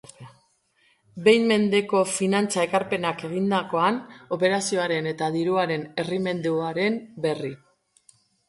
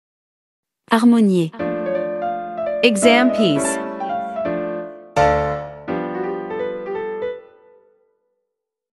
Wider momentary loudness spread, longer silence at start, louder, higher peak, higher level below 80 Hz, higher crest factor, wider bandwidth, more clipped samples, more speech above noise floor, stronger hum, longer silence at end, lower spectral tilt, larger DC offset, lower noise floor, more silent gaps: second, 8 LU vs 13 LU; second, 0.2 s vs 0.9 s; second, -24 LUFS vs -19 LUFS; second, -4 dBFS vs 0 dBFS; second, -70 dBFS vs -46 dBFS; about the same, 20 dB vs 20 dB; about the same, 11.5 kHz vs 12 kHz; neither; second, 41 dB vs 65 dB; neither; second, 0.9 s vs 1.5 s; about the same, -4.5 dB/octave vs -5 dB/octave; neither; second, -65 dBFS vs -80 dBFS; neither